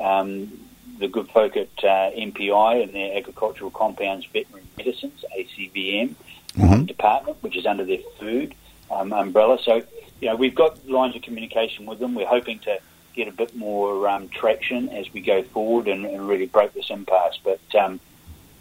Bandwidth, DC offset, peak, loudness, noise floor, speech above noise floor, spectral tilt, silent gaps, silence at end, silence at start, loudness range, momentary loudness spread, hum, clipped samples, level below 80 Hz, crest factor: 16 kHz; under 0.1%; -2 dBFS; -23 LUFS; -46 dBFS; 24 dB; -6.5 dB/octave; none; 0.25 s; 0 s; 4 LU; 12 LU; none; under 0.1%; -44 dBFS; 20 dB